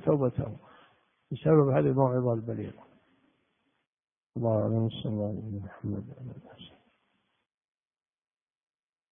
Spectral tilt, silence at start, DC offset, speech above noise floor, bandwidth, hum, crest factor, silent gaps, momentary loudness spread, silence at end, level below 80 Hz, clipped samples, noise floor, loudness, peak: -12 dB/octave; 0 s; under 0.1%; 47 dB; 3.7 kHz; none; 22 dB; 3.89-3.93 s, 4.26-4.30 s; 20 LU; 2.45 s; -62 dBFS; under 0.1%; -75 dBFS; -29 LUFS; -10 dBFS